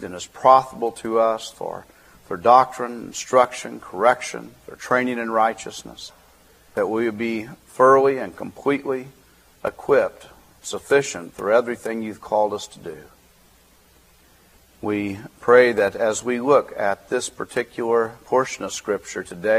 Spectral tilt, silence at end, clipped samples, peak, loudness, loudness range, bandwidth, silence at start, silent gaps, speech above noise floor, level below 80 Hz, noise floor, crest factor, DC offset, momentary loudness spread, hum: -4 dB/octave; 0 s; under 0.1%; 0 dBFS; -21 LUFS; 5 LU; 15.5 kHz; 0 s; none; 34 dB; -60 dBFS; -54 dBFS; 22 dB; under 0.1%; 18 LU; none